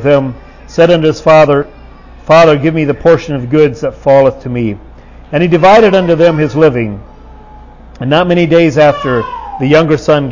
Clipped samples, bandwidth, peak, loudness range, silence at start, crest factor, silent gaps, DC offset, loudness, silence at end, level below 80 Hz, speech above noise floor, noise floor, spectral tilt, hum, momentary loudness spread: 0.5%; 7.4 kHz; 0 dBFS; 2 LU; 0 s; 10 dB; none; under 0.1%; -9 LUFS; 0 s; -36 dBFS; 25 dB; -33 dBFS; -7 dB/octave; none; 13 LU